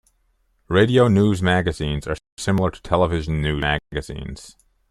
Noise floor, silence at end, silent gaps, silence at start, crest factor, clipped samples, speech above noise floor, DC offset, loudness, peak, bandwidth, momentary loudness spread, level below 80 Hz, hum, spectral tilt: -65 dBFS; 0.4 s; 2.32-2.37 s; 0.7 s; 18 dB; under 0.1%; 45 dB; under 0.1%; -20 LUFS; -2 dBFS; 12.5 kHz; 15 LU; -38 dBFS; none; -6.5 dB/octave